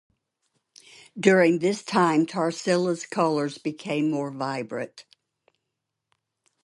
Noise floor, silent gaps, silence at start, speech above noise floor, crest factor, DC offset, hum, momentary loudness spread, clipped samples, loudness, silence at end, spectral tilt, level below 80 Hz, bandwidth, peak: -82 dBFS; none; 1.15 s; 59 dB; 22 dB; under 0.1%; none; 13 LU; under 0.1%; -24 LUFS; 1.65 s; -5.5 dB/octave; -74 dBFS; 11.5 kHz; -4 dBFS